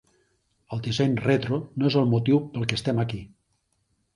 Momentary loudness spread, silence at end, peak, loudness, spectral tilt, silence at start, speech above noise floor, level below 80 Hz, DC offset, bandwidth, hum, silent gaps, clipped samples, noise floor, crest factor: 10 LU; 0.9 s; -4 dBFS; -25 LUFS; -7 dB/octave; 0.7 s; 48 dB; -56 dBFS; under 0.1%; 11 kHz; none; none; under 0.1%; -72 dBFS; 22 dB